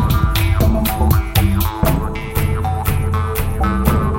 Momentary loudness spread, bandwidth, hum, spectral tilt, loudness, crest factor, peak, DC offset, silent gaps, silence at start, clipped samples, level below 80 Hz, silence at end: 4 LU; 17 kHz; none; -6 dB/octave; -17 LUFS; 14 dB; 0 dBFS; under 0.1%; none; 0 s; under 0.1%; -20 dBFS; 0 s